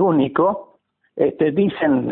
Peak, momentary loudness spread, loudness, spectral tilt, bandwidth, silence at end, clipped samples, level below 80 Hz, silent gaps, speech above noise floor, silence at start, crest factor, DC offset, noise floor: -4 dBFS; 9 LU; -19 LUFS; -12.5 dB/octave; 4.1 kHz; 0 s; under 0.1%; -58 dBFS; none; 30 dB; 0 s; 14 dB; under 0.1%; -48 dBFS